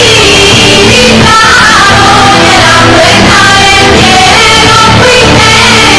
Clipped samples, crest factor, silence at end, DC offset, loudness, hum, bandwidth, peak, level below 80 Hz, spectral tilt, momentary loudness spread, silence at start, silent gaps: 40%; 2 dB; 0 s; 2%; -1 LUFS; none; 11 kHz; 0 dBFS; -20 dBFS; -3 dB/octave; 1 LU; 0 s; none